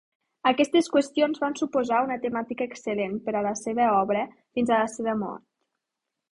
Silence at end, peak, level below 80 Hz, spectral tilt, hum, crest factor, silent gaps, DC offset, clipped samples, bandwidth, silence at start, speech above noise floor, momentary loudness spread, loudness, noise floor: 0.95 s; -6 dBFS; -66 dBFS; -4.5 dB/octave; none; 20 dB; none; under 0.1%; under 0.1%; 11.5 kHz; 0.45 s; 60 dB; 9 LU; -26 LUFS; -85 dBFS